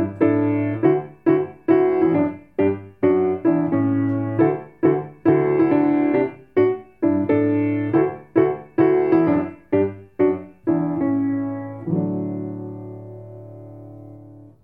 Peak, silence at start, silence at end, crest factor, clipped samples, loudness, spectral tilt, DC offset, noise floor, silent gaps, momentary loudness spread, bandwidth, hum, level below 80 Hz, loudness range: -2 dBFS; 0 s; 0.2 s; 18 dB; under 0.1%; -20 LUFS; -11.5 dB/octave; 0.1%; -43 dBFS; none; 14 LU; 3.9 kHz; none; -62 dBFS; 6 LU